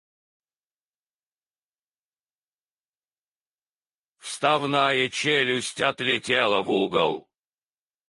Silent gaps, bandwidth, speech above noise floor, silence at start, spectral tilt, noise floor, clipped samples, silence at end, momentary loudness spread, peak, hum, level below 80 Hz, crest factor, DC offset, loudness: none; 11.5 kHz; over 67 dB; 4.25 s; -3.5 dB/octave; under -90 dBFS; under 0.1%; 0.9 s; 5 LU; -6 dBFS; none; -70 dBFS; 22 dB; under 0.1%; -23 LUFS